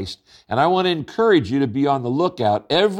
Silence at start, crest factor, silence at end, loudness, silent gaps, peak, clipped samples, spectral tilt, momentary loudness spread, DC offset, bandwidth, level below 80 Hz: 0 s; 14 dB; 0 s; -19 LUFS; none; -4 dBFS; under 0.1%; -6.5 dB/octave; 7 LU; under 0.1%; 11 kHz; -56 dBFS